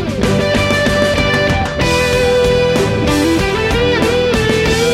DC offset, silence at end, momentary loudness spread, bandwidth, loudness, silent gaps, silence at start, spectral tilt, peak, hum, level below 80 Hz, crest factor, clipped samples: under 0.1%; 0 s; 2 LU; 16 kHz; -13 LUFS; none; 0 s; -5 dB/octave; -2 dBFS; none; -26 dBFS; 12 dB; under 0.1%